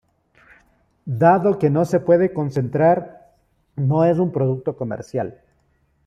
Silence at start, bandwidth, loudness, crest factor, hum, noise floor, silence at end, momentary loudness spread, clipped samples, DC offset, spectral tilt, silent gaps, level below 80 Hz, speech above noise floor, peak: 1.05 s; 12 kHz; -19 LUFS; 18 dB; none; -63 dBFS; 0.75 s; 14 LU; under 0.1%; under 0.1%; -9.5 dB/octave; none; -58 dBFS; 45 dB; -2 dBFS